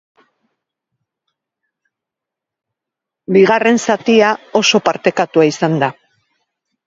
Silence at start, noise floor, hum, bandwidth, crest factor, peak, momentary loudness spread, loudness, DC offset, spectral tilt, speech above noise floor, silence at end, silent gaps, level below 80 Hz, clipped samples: 3.3 s; -83 dBFS; none; 7.8 kHz; 16 dB; 0 dBFS; 5 LU; -13 LUFS; under 0.1%; -4.5 dB/octave; 71 dB; 0.95 s; none; -64 dBFS; under 0.1%